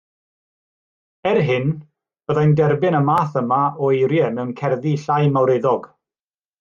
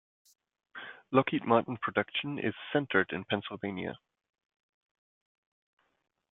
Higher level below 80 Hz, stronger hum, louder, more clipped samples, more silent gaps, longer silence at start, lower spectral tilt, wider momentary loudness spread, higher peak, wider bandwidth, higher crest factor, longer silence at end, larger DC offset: first, -60 dBFS vs -74 dBFS; neither; first, -18 LUFS vs -31 LUFS; neither; neither; first, 1.25 s vs 0.75 s; about the same, -8.5 dB/octave vs -7.5 dB/octave; second, 8 LU vs 18 LU; first, -4 dBFS vs -8 dBFS; about the same, 7 kHz vs 7.4 kHz; second, 14 dB vs 26 dB; second, 0.75 s vs 2.35 s; neither